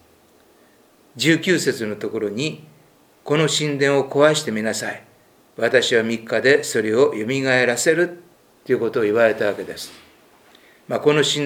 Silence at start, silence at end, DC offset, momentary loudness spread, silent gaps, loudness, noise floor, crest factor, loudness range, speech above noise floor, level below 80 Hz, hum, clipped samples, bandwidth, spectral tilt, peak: 1.15 s; 0 s; under 0.1%; 11 LU; none; -19 LUFS; -54 dBFS; 20 dB; 4 LU; 35 dB; -70 dBFS; none; under 0.1%; 19 kHz; -4 dB/octave; 0 dBFS